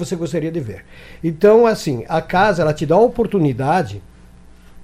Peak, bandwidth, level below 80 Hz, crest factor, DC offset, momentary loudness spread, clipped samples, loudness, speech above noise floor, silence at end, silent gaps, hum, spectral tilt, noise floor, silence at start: -2 dBFS; 15 kHz; -42 dBFS; 14 dB; under 0.1%; 15 LU; under 0.1%; -16 LUFS; 26 dB; 0 s; none; none; -6.5 dB/octave; -43 dBFS; 0 s